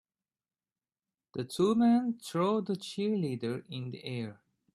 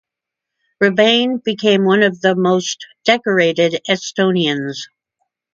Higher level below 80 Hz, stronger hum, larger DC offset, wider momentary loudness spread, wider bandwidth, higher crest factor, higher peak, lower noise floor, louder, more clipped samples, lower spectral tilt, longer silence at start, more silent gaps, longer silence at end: second, -74 dBFS vs -64 dBFS; neither; neither; first, 14 LU vs 9 LU; first, 13 kHz vs 7.8 kHz; about the same, 16 dB vs 16 dB; second, -16 dBFS vs 0 dBFS; first, under -90 dBFS vs -83 dBFS; second, -32 LUFS vs -15 LUFS; neither; first, -6.5 dB/octave vs -4.5 dB/octave; first, 1.35 s vs 0.8 s; neither; second, 0.4 s vs 0.7 s